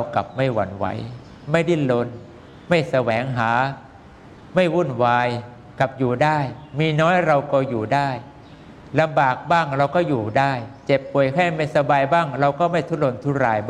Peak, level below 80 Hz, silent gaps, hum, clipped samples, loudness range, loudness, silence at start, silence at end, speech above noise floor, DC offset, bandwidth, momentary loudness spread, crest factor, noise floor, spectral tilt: -4 dBFS; -54 dBFS; none; none; under 0.1%; 3 LU; -20 LUFS; 0 s; 0 s; 24 dB; under 0.1%; 10.5 kHz; 9 LU; 18 dB; -44 dBFS; -7 dB/octave